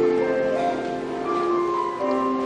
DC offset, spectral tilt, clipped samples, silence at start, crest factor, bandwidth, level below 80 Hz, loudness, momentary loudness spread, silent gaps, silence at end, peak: under 0.1%; -6 dB/octave; under 0.1%; 0 s; 12 dB; 9.8 kHz; -56 dBFS; -24 LUFS; 5 LU; none; 0 s; -10 dBFS